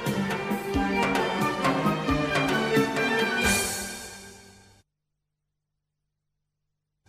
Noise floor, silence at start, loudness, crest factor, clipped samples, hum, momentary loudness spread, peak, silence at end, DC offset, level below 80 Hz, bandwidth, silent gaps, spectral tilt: -82 dBFS; 0 s; -25 LUFS; 18 dB; under 0.1%; 50 Hz at -50 dBFS; 9 LU; -10 dBFS; 2.6 s; under 0.1%; -48 dBFS; 16 kHz; none; -4 dB/octave